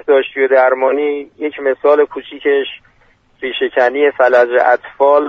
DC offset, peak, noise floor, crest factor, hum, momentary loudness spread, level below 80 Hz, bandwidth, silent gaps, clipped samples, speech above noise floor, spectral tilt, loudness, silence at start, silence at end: under 0.1%; 0 dBFS; -52 dBFS; 14 dB; none; 10 LU; -58 dBFS; 6.2 kHz; none; under 0.1%; 39 dB; -4.5 dB/octave; -14 LUFS; 0.05 s; 0 s